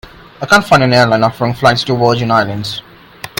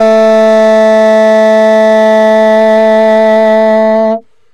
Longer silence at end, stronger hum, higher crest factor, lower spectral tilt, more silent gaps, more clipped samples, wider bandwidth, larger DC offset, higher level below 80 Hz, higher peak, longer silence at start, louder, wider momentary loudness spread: second, 0.15 s vs 0.35 s; neither; first, 12 dB vs 6 dB; about the same, -5 dB/octave vs -5.5 dB/octave; neither; first, 0.3% vs under 0.1%; first, 17.5 kHz vs 10.5 kHz; neither; first, -42 dBFS vs -54 dBFS; about the same, 0 dBFS vs 0 dBFS; about the same, 0.05 s vs 0 s; second, -11 LUFS vs -6 LUFS; first, 15 LU vs 2 LU